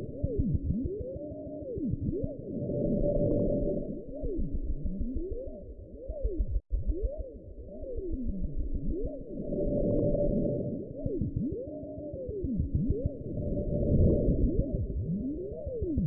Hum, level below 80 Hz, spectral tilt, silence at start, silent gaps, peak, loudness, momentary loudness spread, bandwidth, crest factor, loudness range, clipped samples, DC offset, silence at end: none; -36 dBFS; -16.5 dB/octave; 0 s; none; -14 dBFS; -33 LUFS; 12 LU; 1.1 kHz; 18 dB; 7 LU; under 0.1%; under 0.1%; 0 s